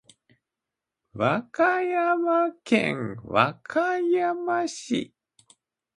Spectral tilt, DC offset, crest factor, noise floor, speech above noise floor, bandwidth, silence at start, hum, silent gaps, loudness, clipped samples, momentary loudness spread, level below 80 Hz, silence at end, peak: -5.5 dB/octave; under 0.1%; 22 dB; -87 dBFS; 63 dB; 11 kHz; 1.15 s; none; none; -25 LUFS; under 0.1%; 7 LU; -66 dBFS; 0.9 s; -4 dBFS